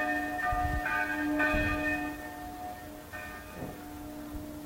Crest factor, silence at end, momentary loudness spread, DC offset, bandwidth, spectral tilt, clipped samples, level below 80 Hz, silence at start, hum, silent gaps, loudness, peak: 18 dB; 0 s; 15 LU; under 0.1%; 16 kHz; -5.5 dB/octave; under 0.1%; -44 dBFS; 0 s; none; none; -33 LUFS; -16 dBFS